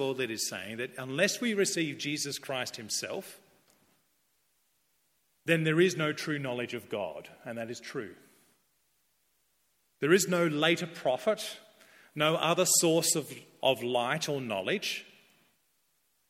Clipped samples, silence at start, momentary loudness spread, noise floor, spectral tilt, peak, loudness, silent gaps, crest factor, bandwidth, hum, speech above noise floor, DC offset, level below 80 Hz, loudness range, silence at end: under 0.1%; 0 s; 15 LU; -74 dBFS; -3.5 dB/octave; -10 dBFS; -30 LUFS; none; 22 dB; 16.5 kHz; none; 44 dB; under 0.1%; -78 dBFS; 11 LU; 1.25 s